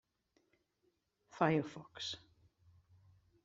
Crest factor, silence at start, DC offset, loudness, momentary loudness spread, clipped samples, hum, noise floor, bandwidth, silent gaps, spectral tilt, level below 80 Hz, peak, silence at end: 26 dB; 1.35 s; under 0.1%; -38 LUFS; 15 LU; under 0.1%; none; -81 dBFS; 7.8 kHz; none; -4.5 dB/octave; -78 dBFS; -16 dBFS; 1.25 s